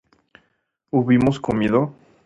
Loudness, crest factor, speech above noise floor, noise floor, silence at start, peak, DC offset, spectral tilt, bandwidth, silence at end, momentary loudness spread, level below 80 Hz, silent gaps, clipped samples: -20 LUFS; 18 dB; 52 dB; -70 dBFS; 0.95 s; -4 dBFS; under 0.1%; -8 dB/octave; 8 kHz; 0.35 s; 7 LU; -48 dBFS; none; under 0.1%